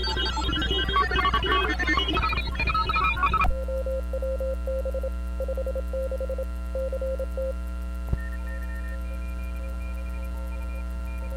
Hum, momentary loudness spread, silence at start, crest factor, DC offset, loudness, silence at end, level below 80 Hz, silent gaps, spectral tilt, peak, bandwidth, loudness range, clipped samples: none; 11 LU; 0 s; 16 dB; under 0.1%; -28 LUFS; 0 s; -30 dBFS; none; -5.5 dB/octave; -10 dBFS; 14 kHz; 10 LU; under 0.1%